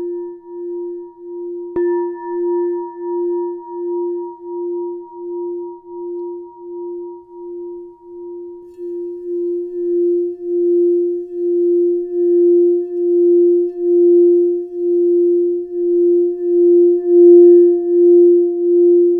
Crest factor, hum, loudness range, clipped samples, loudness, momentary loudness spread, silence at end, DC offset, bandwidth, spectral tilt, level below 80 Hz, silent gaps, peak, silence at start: 14 dB; none; 17 LU; under 0.1%; -14 LUFS; 20 LU; 0 s; under 0.1%; 1.9 kHz; -11 dB/octave; -64 dBFS; none; -2 dBFS; 0 s